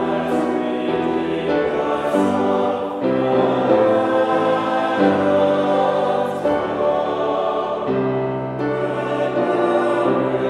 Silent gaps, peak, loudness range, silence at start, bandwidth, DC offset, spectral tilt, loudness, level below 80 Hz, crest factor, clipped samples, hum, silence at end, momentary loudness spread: none; -2 dBFS; 3 LU; 0 s; 12 kHz; under 0.1%; -7 dB/octave; -19 LUFS; -56 dBFS; 16 dB; under 0.1%; none; 0 s; 5 LU